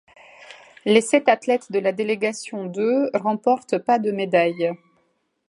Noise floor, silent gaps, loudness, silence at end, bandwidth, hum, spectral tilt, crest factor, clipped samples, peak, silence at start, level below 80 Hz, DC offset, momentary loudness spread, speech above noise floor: -68 dBFS; none; -21 LUFS; 0.75 s; 11.5 kHz; none; -4.5 dB/octave; 20 dB; under 0.1%; -2 dBFS; 0.4 s; -76 dBFS; under 0.1%; 8 LU; 47 dB